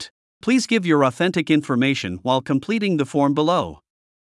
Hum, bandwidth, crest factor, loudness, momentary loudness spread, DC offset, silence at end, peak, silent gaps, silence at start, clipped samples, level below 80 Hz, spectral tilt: none; 12 kHz; 18 dB; -20 LUFS; 5 LU; under 0.1%; 0.65 s; -4 dBFS; 0.11-0.41 s; 0 s; under 0.1%; -62 dBFS; -5.5 dB/octave